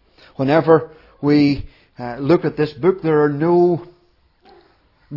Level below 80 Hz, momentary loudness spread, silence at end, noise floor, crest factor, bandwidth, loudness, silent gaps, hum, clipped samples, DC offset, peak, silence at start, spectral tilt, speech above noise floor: -46 dBFS; 11 LU; 0 s; -57 dBFS; 16 dB; 6 kHz; -17 LUFS; none; none; under 0.1%; under 0.1%; -2 dBFS; 0.4 s; -9.5 dB/octave; 41 dB